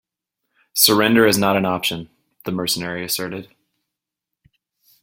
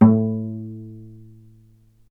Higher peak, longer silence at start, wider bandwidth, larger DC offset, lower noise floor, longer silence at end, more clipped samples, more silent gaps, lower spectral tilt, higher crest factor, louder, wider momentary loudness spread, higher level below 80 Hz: about the same, 0 dBFS vs 0 dBFS; first, 0.75 s vs 0 s; first, 17 kHz vs 2.4 kHz; neither; first, -83 dBFS vs -54 dBFS; first, 1.6 s vs 1 s; neither; neither; second, -3 dB/octave vs -13 dB/octave; about the same, 22 dB vs 22 dB; first, -18 LUFS vs -22 LUFS; second, 17 LU vs 24 LU; about the same, -58 dBFS vs -56 dBFS